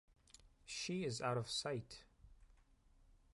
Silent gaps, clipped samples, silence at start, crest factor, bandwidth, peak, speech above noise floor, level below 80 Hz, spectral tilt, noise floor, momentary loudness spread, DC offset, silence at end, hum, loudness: none; under 0.1%; 0.4 s; 20 dB; 11.5 kHz; -26 dBFS; 27 dB; -70 dBFS; -4 dB/octave; -70 dBFS; 18 LU; under 0.1%; 0.15 s; none; -43 LUFS